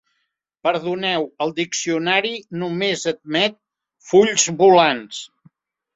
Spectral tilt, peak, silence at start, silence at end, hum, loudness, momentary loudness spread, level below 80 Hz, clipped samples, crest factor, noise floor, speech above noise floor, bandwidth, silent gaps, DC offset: -3 dB/octave; 0 dBFS; 0.65 s; 0.7 s; none; -19 LUFS; 13 LU; -64 dBFS; under 0.1%; 20 dB; -74 dBFS; 55 dB; 8 kHz; none; under 0.1%